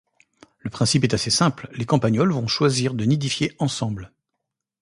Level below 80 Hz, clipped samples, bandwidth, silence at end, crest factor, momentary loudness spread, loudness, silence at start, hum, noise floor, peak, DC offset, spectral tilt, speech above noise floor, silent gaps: -52 dBFS; under 0.1%; 11.5 kHz; 0.75 s; 20 dB; 11 LU; -21 LUFS; 0.65 s; none; -81 dBFS; -4 dBFS; under 0.1%; -5 dB/octave; 60 dB; none